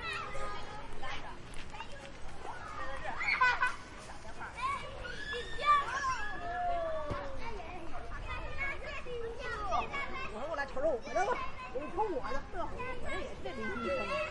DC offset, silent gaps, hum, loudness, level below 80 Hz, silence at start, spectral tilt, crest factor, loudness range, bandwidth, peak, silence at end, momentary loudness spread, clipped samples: under 0.1%; none; none; -37 LUFS; -48 dBFS; 0 s; -4 dB/octave; 18 dB; 6 LU; 11 kHz; -16 dBFS; 0 s; 16 LU; under 0.1%